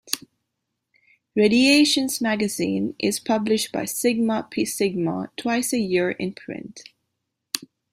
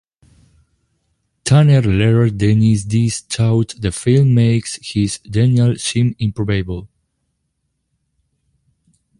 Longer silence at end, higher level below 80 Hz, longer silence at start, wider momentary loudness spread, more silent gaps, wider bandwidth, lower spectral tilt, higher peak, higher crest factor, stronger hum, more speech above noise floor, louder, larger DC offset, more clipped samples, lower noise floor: second, 0.25 s vs 2.35 s; second, -64 dBFS vs -40 dBFS; second, 0.05 s vs 1.45 s; first, 14 LU vs 9 LU; neither; first, 16 kHz vs 11.5 kHz; second, -3.5 dB/octave vs -6.5 dB/octave; about the same, -4 dBFS vs -2 dBFS; first, 20 dB vs 14 dB; neither; about the same, 58 dB vs 56 dB; second, -22 LUFS vs -15 LUFS; neither; neither; first, -80 dBFS vs -70 dBFS